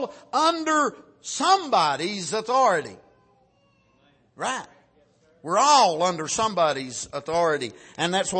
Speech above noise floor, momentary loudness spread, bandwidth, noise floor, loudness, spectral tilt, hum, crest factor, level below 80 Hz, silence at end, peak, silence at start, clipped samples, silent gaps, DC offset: 40 dB; 14 LU; 8.8 kHz; -63 dBFS; -23 LUFS; -2.5 dB/octave; none; 18 dB; -64 dBFS; 0 s; -6 dBFS; 0 s; under 0.1%; none; under 0.1%